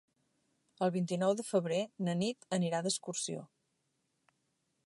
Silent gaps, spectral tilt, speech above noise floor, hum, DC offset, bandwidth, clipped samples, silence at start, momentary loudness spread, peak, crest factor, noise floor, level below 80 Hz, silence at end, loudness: none; -5 dB/octave; 47 dB; none; under 0.1%; 11.5 kHz; under 0.1%; 0.8 s; 5 LU; -18 dBFS; 20 dB; -81 dBFS; -84 dBFS; 1.4 s; -35 LUFS